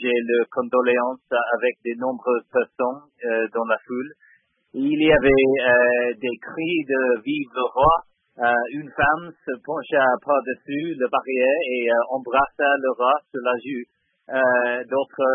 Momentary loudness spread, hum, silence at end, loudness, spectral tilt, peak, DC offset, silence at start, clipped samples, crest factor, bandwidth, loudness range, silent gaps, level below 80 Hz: 11 LU; none; 0 s; -21 LUFS; -10 dB/octave; -4 dBFS; under 0.1%; 0 s; under 0.1%; 18 dB; 3.8 kHz; 4 LU; none; -48 dBFS